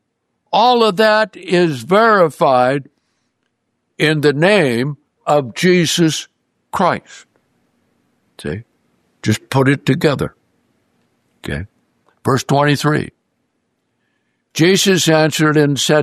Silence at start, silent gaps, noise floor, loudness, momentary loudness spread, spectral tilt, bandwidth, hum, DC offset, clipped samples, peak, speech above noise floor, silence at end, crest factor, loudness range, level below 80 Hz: 0.5 s; none; -70 dBFS; -14 LUFS; 15 LU; -5 dB/octave; 14 kHz; none; under 0.1%; under 0.1%; 0 dBFS; 56 dB; 0 s; 16 dB; 6 LU; -52 dBFS